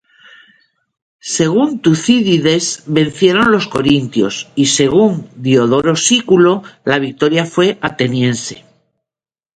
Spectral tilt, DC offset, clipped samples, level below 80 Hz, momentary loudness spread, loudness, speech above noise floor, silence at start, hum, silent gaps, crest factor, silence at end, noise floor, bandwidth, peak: -4.5 dB/octave; under 0.1%; under 0.1%; -50 dBFS; 6 LU; -13 LUFS; over 77 dB; 1.25 s; none; none; 14 dB; 0.95 s; under -90 dBFS; 9.4 kHz; 0 dBFS